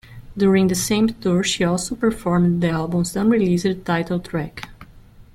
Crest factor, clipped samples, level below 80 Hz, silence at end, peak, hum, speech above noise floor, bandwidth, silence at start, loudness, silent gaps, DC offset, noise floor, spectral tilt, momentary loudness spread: 14 dB; under 0.1%; -44 dBFS; 0.15 s; -6 dBFS; none; 26 dB; 14.5 kHz; 0.1 s; -20 LUFS; none; under 0.1%; -45 dBFS; -5.5 dB/octave; 10 LU